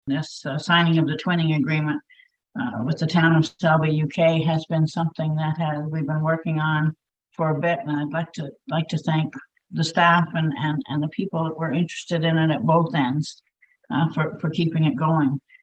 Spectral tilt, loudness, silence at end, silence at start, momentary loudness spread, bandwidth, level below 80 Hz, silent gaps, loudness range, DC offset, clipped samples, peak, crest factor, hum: -7 dB/octave; -23 LUFS; 0.25 s; 0.05 s; 9 LU; 8.4 kHz; -64 dBFS; none; 3 LU; under 0.1%; under 0.1%; -2 dBFS; 20 dB; none